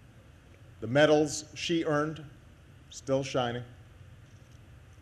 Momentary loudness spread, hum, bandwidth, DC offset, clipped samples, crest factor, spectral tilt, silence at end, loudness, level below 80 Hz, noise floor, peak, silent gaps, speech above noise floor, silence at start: 22 LU; none; 13 kHz; under 0.1%; under 0.1%; 22 dB; -5 dB/octave; 0.65 s; -29 LUFS; -60 dBFS; -55 dBFS; -10 dBFS; none; 26 dB; 0.15 s